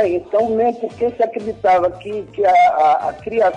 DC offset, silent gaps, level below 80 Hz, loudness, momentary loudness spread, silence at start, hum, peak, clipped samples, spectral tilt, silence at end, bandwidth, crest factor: under 0.1%; none; -50 dBFS; -17 LUFS; 9 LU; 0 s; none; -8 dBFS; under 0.1%; -6 dB/octave; 0 s; 9.2 kHz; 10 dB